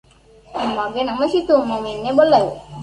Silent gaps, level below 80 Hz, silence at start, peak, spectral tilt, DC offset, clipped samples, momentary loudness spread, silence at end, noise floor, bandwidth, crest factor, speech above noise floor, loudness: none; -50 dBFS; 0.5 s; -2 dBFS; -6 dB/octave; under 0.1%; under 0.1%; 11 LU; 0 s; -47 dBFS; 10.5 kHz; 16 dB; 30 dB; -18 LUFS